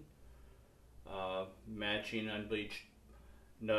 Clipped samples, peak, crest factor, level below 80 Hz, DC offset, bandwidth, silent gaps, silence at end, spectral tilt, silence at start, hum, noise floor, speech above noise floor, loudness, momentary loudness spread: under 0.1%; -22 dBFS; 22 dB; -62 dBFS; under 0.1%; 14 kHz; none; 0 s; -5 dB/octave; 0 s; none; -62 dBFS; 20 dB; -41 LUFS; 24 LU